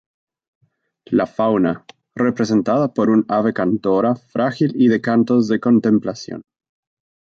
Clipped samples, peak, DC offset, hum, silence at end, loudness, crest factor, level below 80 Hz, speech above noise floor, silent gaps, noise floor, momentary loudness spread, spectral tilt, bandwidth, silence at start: under 0.1%; -4 dBFS; under 0.1%; none; 0.8 s; -17 LUFS; 14 dB; -58 dBFS; 33 dB; none; -50 dBFS; 9 LU; -7.5 dB/octave; 7.2 kHz; 1.1 s